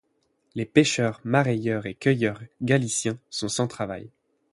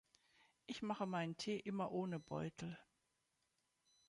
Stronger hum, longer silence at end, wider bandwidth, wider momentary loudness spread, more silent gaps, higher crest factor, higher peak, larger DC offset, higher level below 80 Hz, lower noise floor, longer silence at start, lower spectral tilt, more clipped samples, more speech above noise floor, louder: neither; second, 0.45 s vs 1.25 s; about the same, 11.5 kHz vs 11 kHz; about the same, 12 LU vs 10 LU; neither; about the same, 20 dB vs 18 dB; first, -4 dBFS vs -30 dBFS; neither; first, -60 dBFS vs -80 dBFS; second, -70 dBFS vs -86 dBFS; second, 0.55 s vs 0.7 s; about the same, -5 dB/octave vs -6 dB/octave; neither; first, 46 dB vs 41 dB; first, -25 LUFS vs -45 LUFS